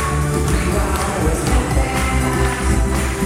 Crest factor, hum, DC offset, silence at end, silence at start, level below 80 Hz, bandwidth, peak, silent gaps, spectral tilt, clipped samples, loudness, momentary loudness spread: 14 dB; none; under 0.1%; 0 s; 0 s; -20 dBFS; 16 kHz; -4 dBFS; none; -5 dB/octave; under 0.1%; -18 LUFS; 1 LU